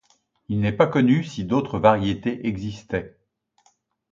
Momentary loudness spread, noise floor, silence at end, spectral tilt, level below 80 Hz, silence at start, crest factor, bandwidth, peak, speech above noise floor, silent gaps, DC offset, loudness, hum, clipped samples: 11 LU; -64 dBFS; 1.05 s; -7.5 dB/octave; -50 dBFS; 0.5 s; 22 dB; 7.6 kHz; -2 dBFS; 43 dB; none; under 0.1%; -22 LUFS; none; under 0.1%